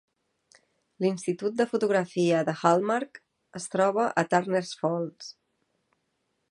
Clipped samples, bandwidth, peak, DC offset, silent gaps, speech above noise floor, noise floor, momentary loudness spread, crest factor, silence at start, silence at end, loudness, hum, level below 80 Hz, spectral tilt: under 0.1%; 11.5 kHz; -6 dBFS; under 0.1%; none; 51 dB; -77 dBFS; 14 LU; 22 dB; 1 s; 1.2 s; -27 LUFS; none; -76 dBFS; -5.5 dB/octave